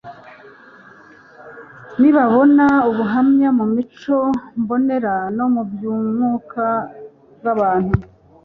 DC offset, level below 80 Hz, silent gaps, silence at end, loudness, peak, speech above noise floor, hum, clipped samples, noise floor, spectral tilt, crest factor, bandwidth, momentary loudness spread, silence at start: under 0.1%; -44 dBFS; none; 0.4 s; -17 LUFS; -2 dBFS; 29 dB; none; under 0.1%; -45 dBFS; -9.5 dB/octave; 16 dB; 5.2 kHz; 11 LU; 0.05 s